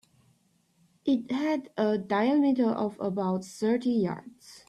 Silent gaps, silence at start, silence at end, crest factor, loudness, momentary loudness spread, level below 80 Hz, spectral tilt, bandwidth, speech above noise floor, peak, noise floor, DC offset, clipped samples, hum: none; 1.05 s; 0.1 s; 14 dB; -28 LUFS; 8 LU; -72 dBFS; -7 dB/octave; 12.5 kHz; 41 dB; -14 dBFS; -68 dBFS; under 0.1%; under 0.1%; none